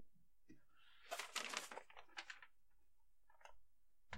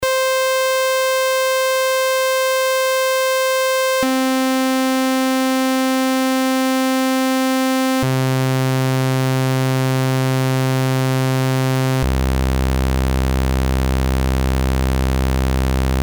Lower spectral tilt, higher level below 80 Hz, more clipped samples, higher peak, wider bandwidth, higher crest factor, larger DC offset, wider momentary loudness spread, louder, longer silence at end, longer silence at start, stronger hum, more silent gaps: second, -0.5 dB/octave vs -5 dB/octave; second, -82 dBFS vs -24 dBFS; neither; second, -24 dBFS vs -6 dBFS; second, 16 kHz vs over 20 kHz; first, 32 dB vs 12 dB; neither; first, 22 LU vs 2 LU; second, -50 LUFS vs -17 LUFS; about the same, 0 s vs 0 s; about the same, 0 s vs 0 s; neither; neither